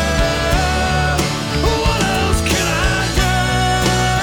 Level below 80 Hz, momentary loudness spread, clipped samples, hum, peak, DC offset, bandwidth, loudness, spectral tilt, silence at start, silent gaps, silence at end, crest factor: -22 dBFS; 2 LU; under 0.1%; none; -4 dBFS; under 0.1%; 19 kHz; -16 LUFS; -4 dB/octave; 0 s; none; 0 s; 12 dB